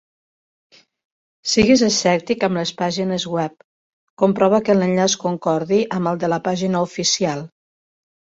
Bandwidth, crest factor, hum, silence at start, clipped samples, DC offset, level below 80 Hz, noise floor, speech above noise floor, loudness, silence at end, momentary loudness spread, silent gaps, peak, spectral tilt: 8 kHz; 18 dB; none; 1.45 s; under 0.1%; under 0.1%; -52 dBFS; under -90 dBFS; over 72 dB; -19 LUFS; 0.9 s; 9 LU; 3.64-4.17 s; -2 dBFS; -4.5 dB/octave